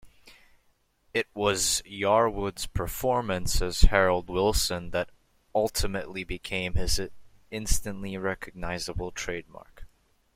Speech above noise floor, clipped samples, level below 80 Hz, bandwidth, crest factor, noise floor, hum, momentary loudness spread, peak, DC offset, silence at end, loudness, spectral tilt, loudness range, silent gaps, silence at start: 41 dB; under 0.1%; -32 dBFS; 16 kHz; 24 dB; -68 dBFS; none; 12 LU; -2 dBFS; under 0.1%; 0.5 s; -28 LUFS; -3.5 dB/octave; 6 LU; none; 0.05 s